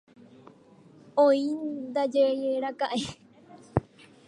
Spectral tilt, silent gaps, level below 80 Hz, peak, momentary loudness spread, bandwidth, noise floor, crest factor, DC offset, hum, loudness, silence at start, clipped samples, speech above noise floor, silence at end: -6 dB/octave; none; -56 dBFS; -6 dBFS; 10 LU; 11 kHz; -55 dBFS; 22 dB; under 0.1%; none; -27 LUFS; 1.15 s; under 0.1%; 29 dB; 0.45 s